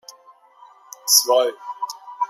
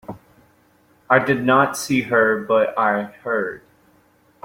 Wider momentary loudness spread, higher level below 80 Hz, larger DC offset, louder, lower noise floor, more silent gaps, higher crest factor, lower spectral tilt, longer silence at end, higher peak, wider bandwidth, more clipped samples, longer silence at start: first, 17 LU vs 9 LU; second, -90 dBFS vs -60 dBFS; neither; about the same, -17 LUFS vs -19 LUFS; second, -51 dBFS vs -57 dBFS; neither; about the same, 22 dB vs 20 dB; second, 3 dB/octave vs -5 dB/octave; second, 0.05 s vs 0.85 s; about the same, 0 dBFS vs -2 dBFS; about the same, 16 kHz vs 16.5 kHz; neither; first, 1.05 s vs 0.1 s